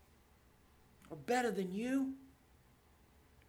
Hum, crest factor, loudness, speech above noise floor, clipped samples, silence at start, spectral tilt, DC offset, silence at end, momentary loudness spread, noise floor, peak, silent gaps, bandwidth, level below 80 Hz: none; 18 dB; -38 LUFS; 30 dB; under 0.1%; 1.05 s; -5.5 dB/octave; under 0.1%; 1.2 s; 17 LU; -67 dBFS; -24 dBFS; none; 18.5 kHz; -70 dBFS